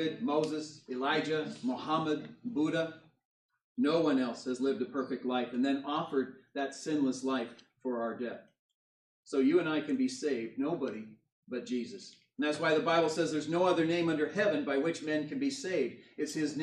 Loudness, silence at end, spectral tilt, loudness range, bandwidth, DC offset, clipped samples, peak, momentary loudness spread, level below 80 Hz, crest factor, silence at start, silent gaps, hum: -33 LUFS; 0 s; -5 dB/octave; 4 LU; 11.5 kHz; under 0.1%; under 0.1%; -16 dBFS; 11 LU; -82 dBFS; 16 dB; 0 s; 3.25-3.49 s, 3.64-3.75 s, 8.59-8.69 s, 8.75-9.23 s, 11.32-11.43 s; none